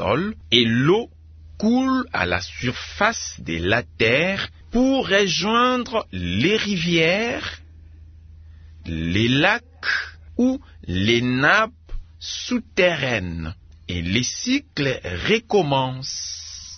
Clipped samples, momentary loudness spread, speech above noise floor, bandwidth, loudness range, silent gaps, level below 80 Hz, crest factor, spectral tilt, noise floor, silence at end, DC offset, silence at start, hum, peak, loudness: under 0.1%; 12 LU; 23 dB; 6.6 kHz; 3 LU; none; -44 dBFS; 20 dB; -4.5 dB/octave; -44 dBFS; 0 s; under 0.1%; 0 s; none; -2 dBFS; -21 LUFS